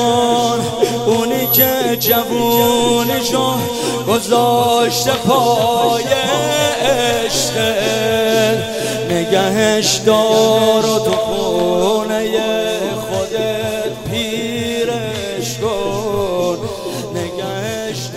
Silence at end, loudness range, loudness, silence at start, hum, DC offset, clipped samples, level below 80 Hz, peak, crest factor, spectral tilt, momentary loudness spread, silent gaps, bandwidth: 0 s; 6 LU; -15 LUFS; 0 s; none; under 0.1%; under 0.1%; -44 dBFS; 0 dBFS; 16 dB; -3.5 dB/octave; 8 LU; none; 16 kHz